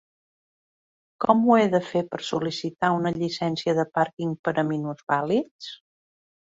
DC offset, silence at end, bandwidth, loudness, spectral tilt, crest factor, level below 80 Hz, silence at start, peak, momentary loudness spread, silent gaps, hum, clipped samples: under 0.1%; 0.7 s; 7.8 kHz; -24 LUFS; -6.5 dB/octave; 22 dB; -66 dBFS; 1.2 s; -2 dBFS; 10 LU; 4.13-4.17 s, 4.39-4.44 s, 5.03-5.07 s, 5.51-5.59 s; none; under 0.1%